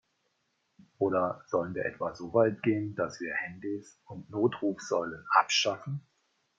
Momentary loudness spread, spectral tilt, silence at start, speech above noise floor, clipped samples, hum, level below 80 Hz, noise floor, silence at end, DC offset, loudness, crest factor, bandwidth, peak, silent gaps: 13 LU; -4.5 dB/octave; 1 s; 47 dB; under 0.1%; none; -72 dBFS; -77 dBFS; 0.6 s; under 0.1%; -30 LUFS; 24 dB; 7.8 kHz; -8 dBFS; none